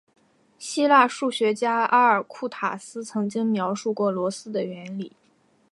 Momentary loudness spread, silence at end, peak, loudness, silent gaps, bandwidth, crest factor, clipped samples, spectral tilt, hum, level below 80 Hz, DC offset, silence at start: 16 LU; 0.65 s; -4 dBFS; -23 LUFS; none; 11.5 kHz; 20 dB; under 0.1%; -4.5 dB/octave; none; -80 dBFS; under 0.1%; 0.6 s